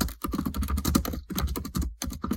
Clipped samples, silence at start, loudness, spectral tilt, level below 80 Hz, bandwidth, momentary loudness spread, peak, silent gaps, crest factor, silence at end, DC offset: under 0.1%; 0 s; -30 LUFS; -5 dB/octave; -34 dBFS; 17 kHz; 7 LU; -8 dBFS; none; 22 dB; 0 s; under 0.1%